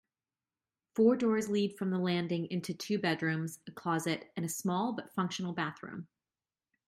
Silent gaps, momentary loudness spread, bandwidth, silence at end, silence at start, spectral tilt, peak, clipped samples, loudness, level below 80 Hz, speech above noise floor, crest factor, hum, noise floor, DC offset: none; 11 LU; 16 kHz; 0.8 s; 0.95 s; -5.5 dB/octave; -16 dBFS; under 0.1%; -33 LUFS; -76 dBFS; over 57 dB; 18 dB; none; under -90 dBFS; under 0.1%